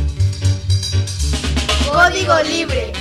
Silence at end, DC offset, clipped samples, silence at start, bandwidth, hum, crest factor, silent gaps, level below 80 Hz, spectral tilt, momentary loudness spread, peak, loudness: 0 s; under 0.1%; under 0.1%; 0 s; 13 kHz; none; 14 dB; none; -24 dBFS; -4.5 dB/octave; 7 LU; -2 dBFS; -16 LUFS